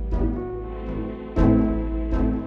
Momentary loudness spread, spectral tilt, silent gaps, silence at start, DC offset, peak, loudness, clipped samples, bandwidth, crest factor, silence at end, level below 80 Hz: 12 LU; -10.5 dB/octave; none; 0 s; under 0.1%; -6 dBFS; -24 LUFS; under 0.1%; 4.9 kHz; 16 dB; 0 s; -28 dBFS